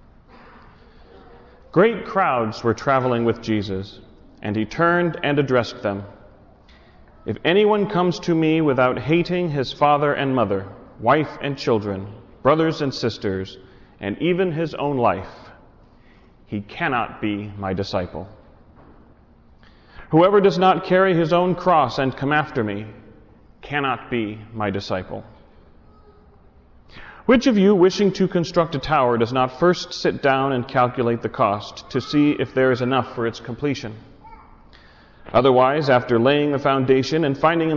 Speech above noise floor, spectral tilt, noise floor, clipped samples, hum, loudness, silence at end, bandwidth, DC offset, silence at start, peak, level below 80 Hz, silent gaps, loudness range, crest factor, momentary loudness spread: 31 dB; -6.5 dB/octave; -51 dBFS; under 0.1%; none; -20 LUFS; 0 s; 6 kHz; under 0.1%; 1.75 s; -6 dBFS; -50 dBFS; none; 9 LU; 14 dB; 13 LU